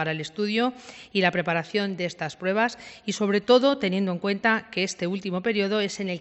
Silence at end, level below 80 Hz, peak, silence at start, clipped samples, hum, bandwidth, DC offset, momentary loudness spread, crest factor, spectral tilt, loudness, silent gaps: 0 s; -66 dBFS; -6 dBFS; 0 s; under 0.1%; none; 8.4 kHz; under 0.1%; 10 LU; 20 dB; -5 dB/octave; -25 LUFS; none